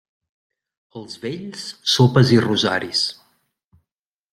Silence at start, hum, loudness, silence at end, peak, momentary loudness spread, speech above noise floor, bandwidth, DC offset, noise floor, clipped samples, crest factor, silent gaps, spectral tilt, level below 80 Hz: 0.95 s; none; -18 LUFS; 1.2 s; -2 dBFS; 17 LU; 67 dB; 14 kHz; under 0.1%; -85 dBFS; under 0.1%; 20 dB; none; -5 dB/octave; -60 dBFS